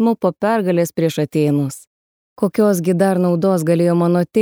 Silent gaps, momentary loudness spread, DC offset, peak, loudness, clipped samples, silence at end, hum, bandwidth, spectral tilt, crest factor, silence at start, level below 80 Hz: 1.87-2.36 s; 5 LU; under 0.1%; -4 dBFS; -17 LUFS; under 0.1%; 0 s; none; 18 kHz; -7 dB/octave; 14 dB; 0 s; -62 dBFS